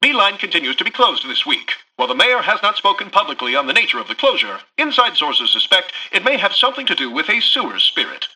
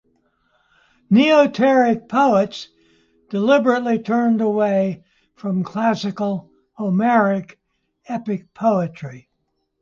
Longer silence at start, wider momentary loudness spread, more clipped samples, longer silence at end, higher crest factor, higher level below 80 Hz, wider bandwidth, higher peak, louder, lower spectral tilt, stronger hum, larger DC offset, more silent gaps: second, 0 s vs 1.1 s; second, 6 LU vs 14 LU; neither; second, 0.1 s vs 0.6 s; about the same, 16 dB vs 16 dB; about the same, -66 dBFS vs -64 dBFS; first, 11.5 kHz vs 7.4 kHz; first, 0 dBFS vs -4 dBFS; first, -15 LUFS vs -18 LUFS; second, -1.5 dB/octave vs -7 dB/octave; neither; neither; neither